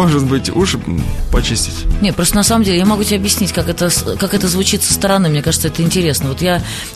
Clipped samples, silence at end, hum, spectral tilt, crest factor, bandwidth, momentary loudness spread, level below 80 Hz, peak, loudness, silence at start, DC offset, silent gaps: under 0.1%; 0 s; none; -4 dB/octave; 14 dB; 13.5 kHz; 5 LU; -24 dBFS; 0 dBFS; -14 LUFS; 0 s; under 0.1%; none